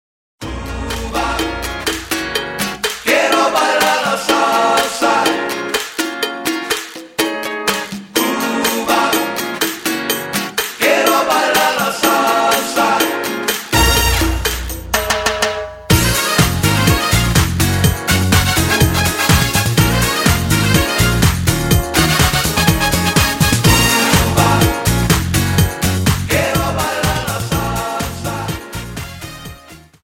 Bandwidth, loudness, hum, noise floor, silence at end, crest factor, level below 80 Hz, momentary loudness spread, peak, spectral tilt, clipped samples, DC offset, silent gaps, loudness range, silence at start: 16.5 kHz; -15 LUFS; none; -40 dBFS; 0.25 s; 16 dB; -28 dBFS; 9 LU; 0 dBFS; -4 dB/octave; under 0.1%; under 0.1%; none; 5 LU; 0.4 s